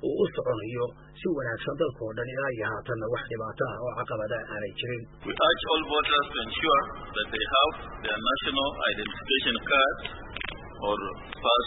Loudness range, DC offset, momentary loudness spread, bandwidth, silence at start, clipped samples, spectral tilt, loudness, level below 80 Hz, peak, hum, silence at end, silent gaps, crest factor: 6 LU; under 0.1%; 11 LU; 4.1 kHz; 0 s; under 0.1%; -8.5 dB/octave; -28 LUFS; -50 dBFS; -10 dBFS; none; 0 s; none; 18 dB